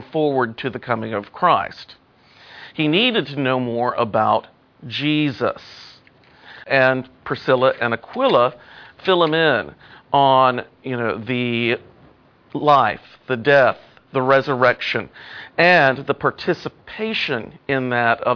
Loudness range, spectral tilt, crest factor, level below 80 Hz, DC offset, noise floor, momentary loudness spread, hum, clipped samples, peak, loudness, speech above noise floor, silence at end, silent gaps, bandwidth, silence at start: 4 LU; -7 dB/octave; 18 dB; -60 dBFS; under 0.1%; -51 dBFS; 13 LU; none; under 0.1%; -2 dBFS; -19 LUFS; 32 dB; 0 s; none; 5.4 kHz; 0 s